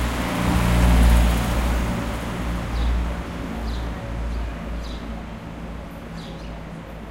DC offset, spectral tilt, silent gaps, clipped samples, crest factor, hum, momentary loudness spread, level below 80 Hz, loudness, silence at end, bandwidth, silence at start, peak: under 0.1%; -6 dB/octave; none; under 0.1%; 16 dB; none; 17 LU; -24 dBFS; -24 LUFS; 0 s; 16 kHz; 0 s; -6 dBFS